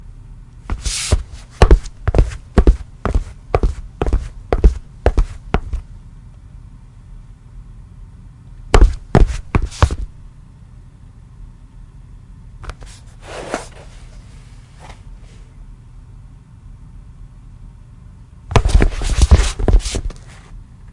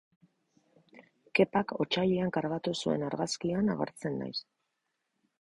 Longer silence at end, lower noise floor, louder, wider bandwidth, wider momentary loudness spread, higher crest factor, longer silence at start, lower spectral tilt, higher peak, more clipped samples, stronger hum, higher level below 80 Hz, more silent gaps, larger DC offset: second, 0.3 s vs 1 s; second, -40 dBFS vs -82 dBFS; first, -18 LUFS vs -31 LUFS; about the same, 11.5 kHz vs 11.5 kHz; first, 27 LU vs 8 LU; about the same, 18 dB vs 22 dB; second, 0.05 s vs 0.95 s; about the same, -5.5 dB/octave vs -5.5 dB/octave; first, 0 dBFS vs -12 dBFS; neither; neither; first, -20 dBFS vs -66 dBFS; neither; neither